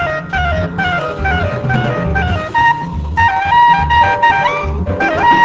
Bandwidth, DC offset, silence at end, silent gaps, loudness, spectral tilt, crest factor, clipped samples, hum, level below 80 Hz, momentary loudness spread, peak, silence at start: 7.8 kHz; under 0.1%; 0 s; none; -13 LUFS; -6 dB/octave; 12 dB; under 0.1%; none; -24 dBFS; 7 LU; 0 dBFS; 0 s